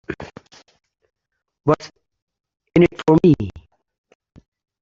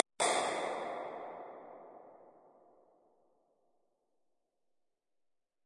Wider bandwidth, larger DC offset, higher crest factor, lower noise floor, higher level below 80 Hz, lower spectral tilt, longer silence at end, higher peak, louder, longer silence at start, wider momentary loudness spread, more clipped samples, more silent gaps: second, 7.4 kHz vs 11.5 kHz; neither; second, 20 dB vs 36 dB; second, -46 dBFS vs -85 dBFS; first, -48 dBFS vs under -90 dBFS; first, -8.5 dB/octave vs -1 dB/octave; second, 1.3 s vs 3.35 s; first, -2 dBFS vs -6 dBFS; first, -17 LUFS vs -36 LUFS; about the same, 0.1 s vs 0.2 s; second, 19 LU vs 24 LU; neither; first, 2.22-2.27 s vs none